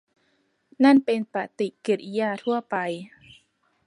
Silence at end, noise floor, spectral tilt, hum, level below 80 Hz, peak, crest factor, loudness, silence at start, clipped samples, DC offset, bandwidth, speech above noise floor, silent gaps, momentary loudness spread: 0.8 s; -69 dBFS; -6 dB/octave; none; -76 dBFS; -8 dBFS; 18 dB; -24 LUFS; 0.8 s; under 0.1%; under 0.1%; 11 kHz; 46 dB; none; 13 LU